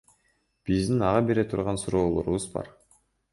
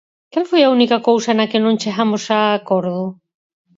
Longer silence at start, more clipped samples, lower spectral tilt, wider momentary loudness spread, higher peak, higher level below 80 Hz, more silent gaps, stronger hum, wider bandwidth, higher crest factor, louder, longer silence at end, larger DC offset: first, 0.65 s vs 0.35 s; neither; first, -6.5 dB/octave vs -5 dB/octave; first, 13 LU vs 10 LU; second, -8 dBFS vs 0 dBFS; first, -46 dBFS vs -68 dBFS; neither; neither; first, 11.5 kHz vs 7.8 kHz; about the same, 18 dB vs 16 dB; second, -26 LUFS vs -16 LUFS; about the same, 0.6 s vs 0.65 s; neither